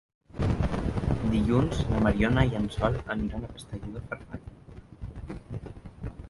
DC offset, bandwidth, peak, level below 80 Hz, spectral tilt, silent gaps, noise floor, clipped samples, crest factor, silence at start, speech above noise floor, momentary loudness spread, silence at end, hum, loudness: under 0.1%; 11.5 kHz; -8 dBFS; -38 dBFS; -7.5 dB/octave; none; -48 dBFS; under 0.1%; 20 dB; 0.35 s; 21 dB; 19 LU; 0 s; none; -28 LUFS